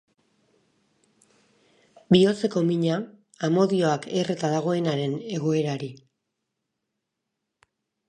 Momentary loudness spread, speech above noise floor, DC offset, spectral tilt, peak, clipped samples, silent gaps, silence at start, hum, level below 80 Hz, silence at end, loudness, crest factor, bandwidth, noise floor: 11 LU; 59 dB; under 0.1%; -6.5 dB/octave; -4 dBFS; under 0.1%; none; 2.1 s; none; -68 dBFS; 2.15 s; -24 LUFS; 22 dB; 10.5 kHz; -82 dBFS